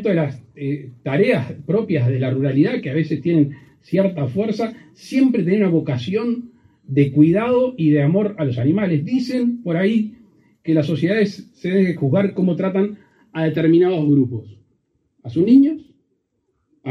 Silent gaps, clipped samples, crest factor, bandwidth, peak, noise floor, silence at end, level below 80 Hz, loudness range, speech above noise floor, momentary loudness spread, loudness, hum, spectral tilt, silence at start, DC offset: none; under 0.1%; 16 dB; 9.8 kHz; -2 dBFS; -70 dBFS; 0 s; -60 dBFS; 2 LU; 52 dB; 12 LU; -19 LUFS; none; -9 dB/octave; 0 s; under 0.1%